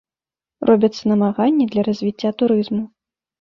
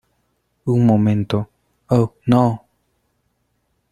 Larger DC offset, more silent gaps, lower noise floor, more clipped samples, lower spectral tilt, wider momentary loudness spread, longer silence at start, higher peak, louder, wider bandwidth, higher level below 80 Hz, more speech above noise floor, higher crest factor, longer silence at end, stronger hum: neither; neither; first, under -90 dBFS vs -68 dBFS; neither; second, -7.5 dB/octave vs -9 dB/octave; second, 8 LU vs 14 LU; about the same, 0.6 s vs 0.65 s; about the same, -2 dBFS vs -2 dBFS; about the same, -18 LUFS vs -18 LUFS; second, 7 kHz vs 10 kHz; second, -60 dBFS vs -52 dBFS; first, over 73 dB vs 52 dB; about the same, 16 dB vs 18 dB; second, 0.55 s vs 1.35 s; neither